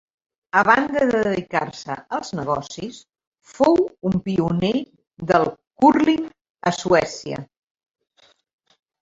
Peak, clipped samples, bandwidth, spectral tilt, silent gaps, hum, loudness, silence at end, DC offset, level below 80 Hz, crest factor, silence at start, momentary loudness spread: -2 dBFS; under 0.1%; 7.8 kHz; -6 dB/octave; 3.27-3.32 s, 6.50-6.55 s; none; -20 LUFS; 1.55 s; under 0.1%; -54 dBFS; 20 dB; 0.55 s; 16 LU